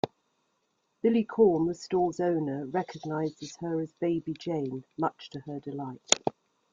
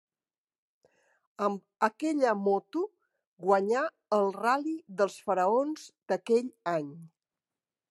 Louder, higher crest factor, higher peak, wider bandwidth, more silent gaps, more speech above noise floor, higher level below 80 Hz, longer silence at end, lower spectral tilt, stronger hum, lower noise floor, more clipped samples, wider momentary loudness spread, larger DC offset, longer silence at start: about the same, -30 LUFS vs -30 LUFS; first, 30 dB vs 20 dB; first, 0 dBFS vs -10 dBFS; second, 9.6 kHz vs 12.5 kHz; second, none vs 3.27-3.37 s; second, 47 dB vs over 61 dB; first, -68 dBFS vs under -90 dBFS; second, 0.4 s vs 0.85 s; about the same, -4.5 dB/octave vs -5.5 dB/octave; neither; second, -76 dBFS vs under -90 dBFS; neither; first, 14 LU vs 9 LU; neither; second, 0.05 s vs 1.4 s